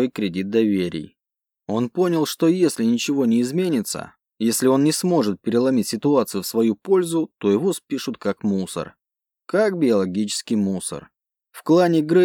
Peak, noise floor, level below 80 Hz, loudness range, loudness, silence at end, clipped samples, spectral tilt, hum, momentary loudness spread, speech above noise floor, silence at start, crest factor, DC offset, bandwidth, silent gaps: -6 dBFS; -87 dBFS; -66 dBFS; 3 LU; -21 LUFS; 0 s; under 0.1%; -5.5 dB/octave; none; 10 LU; 67 dB; 0 s; 16 dB; under 0.1%; 18 kHz; none